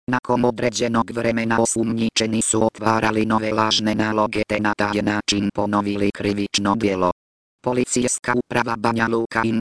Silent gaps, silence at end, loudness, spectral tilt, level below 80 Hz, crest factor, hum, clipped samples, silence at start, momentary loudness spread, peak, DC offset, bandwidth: 0.19-0.23 s, 7.12-7.58 s; 0 s; -20 LUFS; -4 dB/octave; -48 dBFS; 20 dB; none; under 0.1%; 0.1 s; 3 LU; -2 dBFS; under 0.1%; 11 kHz